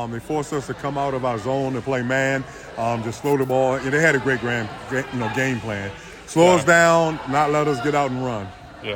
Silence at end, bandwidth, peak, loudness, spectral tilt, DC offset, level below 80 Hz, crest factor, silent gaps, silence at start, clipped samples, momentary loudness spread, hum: 0 s; 19 kHz; -4 dBFS; -21 LUFS; -5 dB/octave; under 0.1%; -50 dBFS; 18 dB; none; 0 s; under 0.1%; 12 LU; none